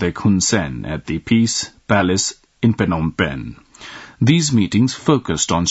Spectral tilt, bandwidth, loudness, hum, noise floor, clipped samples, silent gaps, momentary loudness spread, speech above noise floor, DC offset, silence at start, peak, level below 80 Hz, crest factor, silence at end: -4.5 dB/octave; 8 kHz; -18 LUFS; none; -38 dBFS; under 0.1%; none; 14 LU; 20 dB; under 0.1%; 0 s; 0 dBFS; -44 dBFS; 18 dB; 0 s